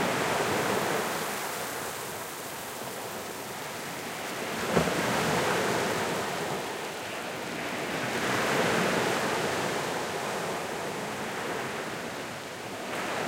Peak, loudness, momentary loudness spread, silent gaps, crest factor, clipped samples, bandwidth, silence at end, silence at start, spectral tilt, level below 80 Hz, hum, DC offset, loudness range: -8 dBFS; -30 LUFS; 10 LU; none; 22 dB; under 0.1%; 16.5 kHz; 0 s; 0 s; -3.5 dB/octave; -60 dBFS; none; under 0.1%; 5 LU